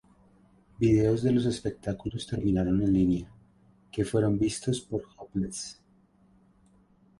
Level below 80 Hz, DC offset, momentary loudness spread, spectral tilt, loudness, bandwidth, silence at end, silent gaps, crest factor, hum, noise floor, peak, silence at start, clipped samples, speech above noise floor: -48 dBFS; under 0.1%; 12 LU; -6.5 dB/octave; -28 LUFS; 11.5 kHz; 1.45 s; none; 18 dB; none; -63 dBFS; -12 dBFS; 0.8 s; under 0.1%; 36 dB